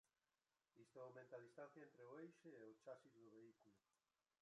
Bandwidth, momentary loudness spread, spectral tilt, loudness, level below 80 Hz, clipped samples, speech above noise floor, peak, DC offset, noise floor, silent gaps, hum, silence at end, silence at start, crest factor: 10.5 kHz; 7 LU; -6.5 dB/octave; -63 LUFS; under -90 dBFS; under 0.1%; over 27 dB; -46 dBFS; under 0.1%; under -90 dBFS; none; none; 0.6 s; 0.75 s; 18 dB